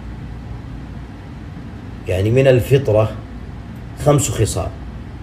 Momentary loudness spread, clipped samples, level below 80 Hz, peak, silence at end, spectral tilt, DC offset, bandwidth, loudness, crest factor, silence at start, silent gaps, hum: 19 LU; under 0.1%; -34 dBFS; 0 dBFS; 0 s; -6 dB/octave; under 0.1%; 15.5 kHz; -16 LUFS; 18 dB; 0 s; none; none